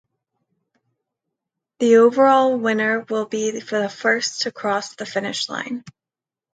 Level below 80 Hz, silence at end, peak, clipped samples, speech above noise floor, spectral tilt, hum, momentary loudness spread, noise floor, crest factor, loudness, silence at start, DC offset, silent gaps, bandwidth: -72 dBFS; 0.65 s; -4 dBFS; under 0.1%; 70 dB; -3.5 dB/octave; none; 12 LU; -89 dBFS; 18 dB; -19 LUFS; 1.8 s; under 0.1%; none; 9.2 kHz